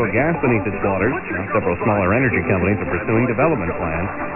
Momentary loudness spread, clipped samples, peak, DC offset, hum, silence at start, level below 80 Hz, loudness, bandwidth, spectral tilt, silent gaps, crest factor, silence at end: 6 LU; under 0.1%; -4 dBFS; under 0.1%; none; 0 s; -42 dBFS; -19 LUFS; 3 kHz; -13 dB/octave; none; 14 dB; 0 s